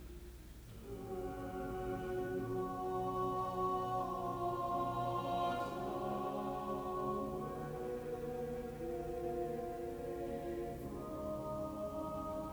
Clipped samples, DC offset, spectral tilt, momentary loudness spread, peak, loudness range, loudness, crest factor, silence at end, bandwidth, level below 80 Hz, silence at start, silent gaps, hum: under 0.1%; under 0.1%; -7 dB/octave; 7 LU; -26 dBFS; 4 LU; -41 LUFS; 14 dB; 0 s; over 20 kHz; -56 dBFS; 0 s; none; none